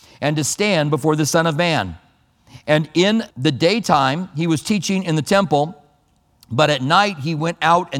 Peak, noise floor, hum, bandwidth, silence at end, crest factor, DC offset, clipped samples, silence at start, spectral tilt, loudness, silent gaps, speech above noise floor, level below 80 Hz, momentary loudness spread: 0 dBFS; -59 dBFS; none; 16.5 kHz; 0 s; 18 dB; under 0.1%; under 0.1%; 0.2 s; -4.5 dB/octave; -18 LUFS; none; 42 dB; -54 dBFS; 6 LU